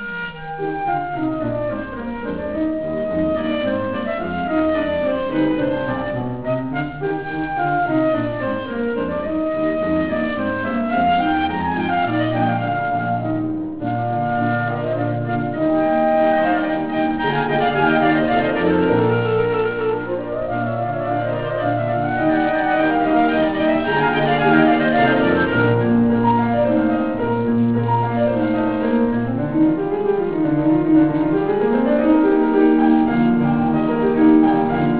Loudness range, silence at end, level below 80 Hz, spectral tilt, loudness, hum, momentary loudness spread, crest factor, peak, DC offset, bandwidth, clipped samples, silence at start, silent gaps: 5 LU; 0 s; -44 dBFS; -11 dB/octave; -19 LUFS; none; 8 LU; 16 dB; -2 dBFS; 0.7%; 4 kHz; under 0.1%; 0 s; none